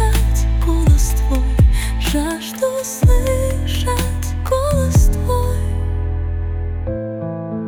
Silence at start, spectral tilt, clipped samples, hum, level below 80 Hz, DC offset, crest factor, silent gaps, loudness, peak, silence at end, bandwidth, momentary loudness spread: 0 s; -6 dB/octave; under 0.1%; none; -18 dBFS; under 0.1%; 12 dB; none; -18 LUFS; -4 dBFS; 0 s; 18.5 kHz; 9 LU